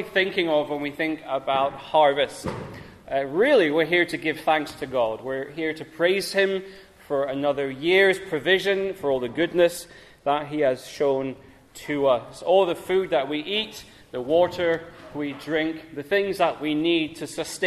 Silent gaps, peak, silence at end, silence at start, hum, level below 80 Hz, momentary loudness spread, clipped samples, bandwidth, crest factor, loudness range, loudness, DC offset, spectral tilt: none; -6 dBFS; 0 s; 0 s; none; -58 dBFS; 12 LU; under 0.1%; 14 kHz; 18 dB; 3 LU; -24 LUFS; under 0.1%; -4.5 dB/octave